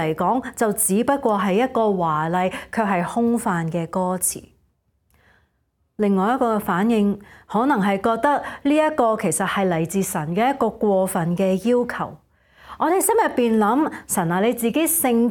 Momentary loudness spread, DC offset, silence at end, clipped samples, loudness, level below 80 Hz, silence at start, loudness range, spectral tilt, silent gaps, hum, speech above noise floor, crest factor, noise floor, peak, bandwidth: 5 LU; under 0.1%; 0 s; under 0.1%; -20 LUFS; -56 dBFS; 0 s; 4 LU; -5 dB/octave; none; none; 49 dB; 16 dB; -69 dBFS; -6 dBFS; 17.5 kHz